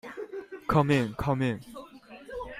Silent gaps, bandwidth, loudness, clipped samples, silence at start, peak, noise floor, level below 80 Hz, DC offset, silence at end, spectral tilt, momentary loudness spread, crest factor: none; 15 kHz; -28 LUFS; under 0.1%; 0.05 s; -10 dBFS; -48 dBFS; -52 dBFS; under 0.1%; 0 s; -7.5 dB/octave; 22 LU; 20 dB